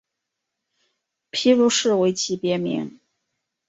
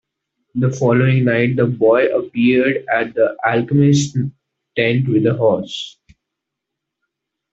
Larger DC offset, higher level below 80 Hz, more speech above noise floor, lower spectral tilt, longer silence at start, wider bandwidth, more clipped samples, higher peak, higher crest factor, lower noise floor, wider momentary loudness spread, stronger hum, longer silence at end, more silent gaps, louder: neither; second, -68 dBFS vs -56 dBFS; about the same, 62 dB vs 65 dB; second, -4 dB/octave vs -6.5 dB/octave; first, 1.35 s vs 0.55 s; about the same, 8 kHz vs 8 kHz; neither; second, -6 dBFS vs 0 dBFS; about the same, 18 dB vs 16 dB; about the same, -82 dBFS vs -80 dBFS; about the same, 12 LU vs 11 LU; neither; second, 0.8 s vs 1.65 s; neither; second, -21 LUFS vs -16 LUFS